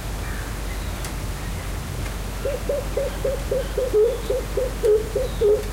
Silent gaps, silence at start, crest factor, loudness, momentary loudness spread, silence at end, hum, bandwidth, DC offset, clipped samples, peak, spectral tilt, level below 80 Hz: none; 0 s; 14 dB; -25 LUFS; 10 LU; 0 s; none; 16 kHz; under 0.1%; under 0.1%; -10 dBFS; -5 dB/octave; -30 dBFS